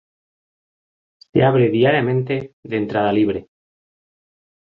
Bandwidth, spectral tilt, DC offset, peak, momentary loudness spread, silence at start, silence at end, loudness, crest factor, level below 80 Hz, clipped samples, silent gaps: 5.2 kHz; -9.5 dB/octave; under 0.1%; -2 dBFS; 10 LU; 1.35 s; 1.25 s; -18 LUFS; 18 dB; -54 dBFS; under 0.1%; 2.53-2.63 s